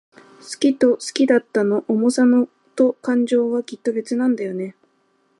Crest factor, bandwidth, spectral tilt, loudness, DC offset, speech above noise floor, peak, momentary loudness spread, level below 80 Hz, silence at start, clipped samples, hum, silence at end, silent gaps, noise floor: 16 dB; 11.5 kHz; -5 dB/octave; -19 LUFS; under 0.1%; 45 dB; -4 dBFS; 10 LU; -72 dBFS; 0.45 s; under 0.1%; none; 0.7 s; none; -63 dBFS